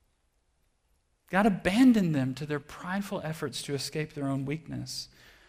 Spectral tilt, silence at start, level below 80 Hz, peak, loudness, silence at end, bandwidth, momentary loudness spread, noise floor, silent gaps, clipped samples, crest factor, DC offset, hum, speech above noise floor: -5.5 dB/octave; 1.3 s; -58 dBFS; -12 dBFS; -29 LUFS; 0.4 s; 15.5 kHz; 14 LU; -72 dBFS; none; under 0.1%; 18 dB; under 0.1%; none; 44 dB